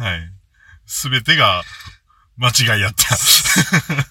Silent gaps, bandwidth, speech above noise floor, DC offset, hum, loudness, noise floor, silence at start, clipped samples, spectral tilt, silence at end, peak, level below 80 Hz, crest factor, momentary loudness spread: none; 18 kHz; 33 dB; under 0.1%; none; -14 LUFS; -48 dBFS; 0 s; under 0.1%; -2 dB/octave; 0.05 s; 0 dBFS; -44 dBFS; 18 dB; 14 LU